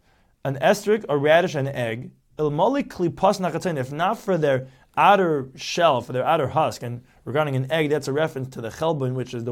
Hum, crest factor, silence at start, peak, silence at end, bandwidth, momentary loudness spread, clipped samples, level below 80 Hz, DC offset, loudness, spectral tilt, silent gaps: none; 18 dB; 0.45 s; -4 dBFS; 0 s; 17 kHz; 12 LU; under 0.1%; -58 dBFS; under 0.1%; -22 LUFS; -5.5 dB/octave; none